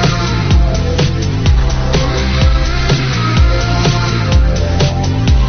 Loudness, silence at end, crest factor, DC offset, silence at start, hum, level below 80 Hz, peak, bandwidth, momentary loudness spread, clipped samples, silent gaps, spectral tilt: -13 LUFS; 0 s; 12 dB; under 0.1%; 0 s; none; -14 dBFS; 0 dBFS; 6.8 kHz; 2 LU; under 0.1%; none; -5.5 dB/octave